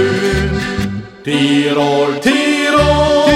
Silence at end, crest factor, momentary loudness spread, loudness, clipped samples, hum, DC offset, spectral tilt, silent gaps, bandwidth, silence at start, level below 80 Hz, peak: 0 s; 12 dB; 8 LU; -13 LUFS; under 0.1%; none; under 0.1%; -5 dB/octave; none; 15 kHz; 0 s; -28 dBFS; 0 dBFS